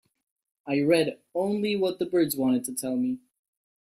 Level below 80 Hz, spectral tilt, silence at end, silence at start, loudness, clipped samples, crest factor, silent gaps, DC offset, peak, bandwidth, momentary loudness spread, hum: -70 dBFS; -5 dB/octave; 0.65 s; 0.65 s; -26 LUFS; under 0.1%; 18 dB; none; under 0.1%; -10 dBFS; 16 kHz; 7 LU; none